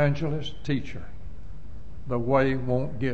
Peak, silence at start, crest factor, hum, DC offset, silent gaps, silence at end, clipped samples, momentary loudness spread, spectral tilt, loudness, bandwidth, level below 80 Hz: -10 dBFS; 0 s; 18 dB; none; 3%; none; 0 s; under 0.1%; 22 LU; -8 dB/octave; -27 LUFS; 7.8 kHz; -44 dBFS